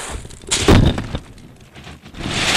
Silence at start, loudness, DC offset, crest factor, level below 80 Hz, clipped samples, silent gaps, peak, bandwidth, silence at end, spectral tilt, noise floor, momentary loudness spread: 0 s; -16 LUFS; under 0.1%; 16 dB; -26 dBFS; under 0.1%; none; -4 dBFS; 16 kHz; 0 s; -4.5 dB/octave; -41 dBFS; 25 LU